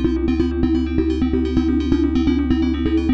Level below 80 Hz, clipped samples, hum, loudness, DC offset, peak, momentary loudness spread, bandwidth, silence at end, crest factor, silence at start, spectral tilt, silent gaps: -26 dBFS; under 0.1%; none; -19 LUFS; 0.3%; -4 dBFS; 2 LU; 7.4 kHz; 0 s; 14 dB; 0 s; -8.5 dB/octave; none